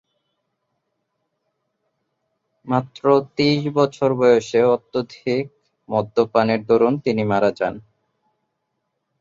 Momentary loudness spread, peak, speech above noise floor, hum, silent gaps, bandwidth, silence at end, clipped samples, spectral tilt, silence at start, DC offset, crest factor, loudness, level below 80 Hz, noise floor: 9 LU; -2 dBFS; 57 dB; none; none; 7.6 kHz; 1.4 s; under 0.1%; -6.5 dB/octave; 2.65 s; under 0.1%; 18 dB; -19 LUFS; -60 dBFS; -75 dBFS